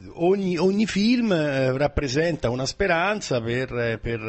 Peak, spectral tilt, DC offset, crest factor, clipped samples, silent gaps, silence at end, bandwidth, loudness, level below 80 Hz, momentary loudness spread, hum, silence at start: -8 dBFS; -5.5 dB/octave; under 0.1%; 14 dB; under 0.1%; none; 0 s; 8.6 kHz; -23 LUFS; -42 dBFS; 5 LU; none; 0 s